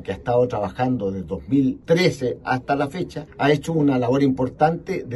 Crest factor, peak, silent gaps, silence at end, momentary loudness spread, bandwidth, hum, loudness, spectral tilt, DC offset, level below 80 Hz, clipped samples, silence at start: 16 dB; -4 dBFS; none; 0 s; 8 LU; 12.5 kHz; none; -21 LUFS; -7 dB/octave; under 0.1%; -48 dBFS; under 0.1%; 0 s